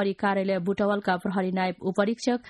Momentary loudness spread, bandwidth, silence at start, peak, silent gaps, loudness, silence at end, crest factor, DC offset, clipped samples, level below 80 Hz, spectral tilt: 2 LU; 11.5 kHz; 0 s; -10 dBFS; none; -26 LUFS; 0 s; 16 dB; under 0.1%; under 0.1%; -64 dBFS; -6.5 dB/octave